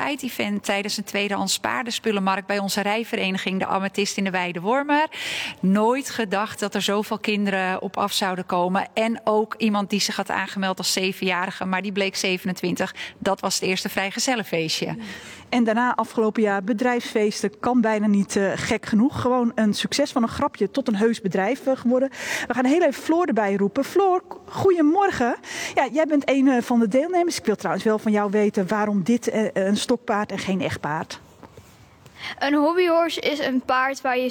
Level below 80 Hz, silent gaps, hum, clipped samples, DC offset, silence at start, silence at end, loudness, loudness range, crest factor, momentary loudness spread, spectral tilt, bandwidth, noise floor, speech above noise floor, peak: -62 dBFS; none; none; under 0.1%; under 0.1%; 0 s; 0 s; -22 LUFS; 3 LU; 16 dB; 6 LU; -4.5 dB/octave; 19.5 kHz; -49 dBFS; 27 dB; -6 dBFS